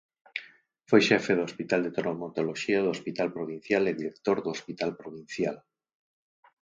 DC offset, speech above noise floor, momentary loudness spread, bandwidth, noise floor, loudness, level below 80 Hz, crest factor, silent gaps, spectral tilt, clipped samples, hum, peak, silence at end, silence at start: under 0.1%; 27 dB; 16 LU; 7.8 kHz; -55 dBFS; -28 LUFS; -70 dBFS; 22 dB; none; -5 dB/octave; under 0.1%; none; -6 dBFS; 1.05 s; 0.35 s